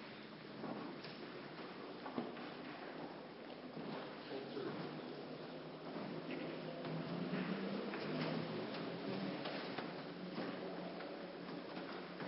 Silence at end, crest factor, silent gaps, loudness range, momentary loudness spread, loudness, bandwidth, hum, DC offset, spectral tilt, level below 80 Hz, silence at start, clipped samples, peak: 0 s; 20 dB; none; 5 LU; 8 LU; -47 LUFS; 5.6 kHz; none; under 0.1%; -4.5 dB/octave; -82 dBFS; 0 s; under 0.1%; -26 dBFS